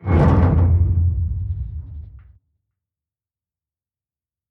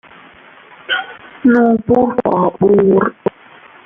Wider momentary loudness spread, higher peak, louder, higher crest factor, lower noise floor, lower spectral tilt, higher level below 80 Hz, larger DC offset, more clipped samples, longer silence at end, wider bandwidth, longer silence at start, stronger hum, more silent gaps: first, 19 LU vs 10 LU; about the same, -4 dBFS vs -2 dBFS; second, -18 LUFS vs -14 LUFS; about the same, 16 dB vs 14 dB; first, under -90 dBFS vs -42 dBFS; first, -10.5 dB/octave vs -9 dB/octave; first, -28 dBFS vs -50 dBFS; neither; neither; first, 2.35 s vs 0.55 s; about the same, 3.6 kHz vs 3.7 kHz; second, 0 s vs 0.9 s; neither; neither